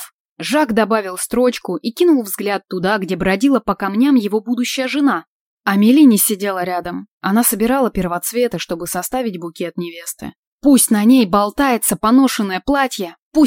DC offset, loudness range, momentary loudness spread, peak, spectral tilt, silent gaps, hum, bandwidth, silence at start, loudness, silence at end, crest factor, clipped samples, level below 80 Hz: under 0.1%; 4 LU; 13 LU; 0 dBFS; -4 dB/octave; 0.13-0.36 s, 5.27-5.57 s, 7.11-7.21 s, 10.36-10.59 s, 13.19-13.31 s; none; 17 kHz; 0 s; -16 LUFS; 0 s; 14 dB; under 0.1%; -46 dBFS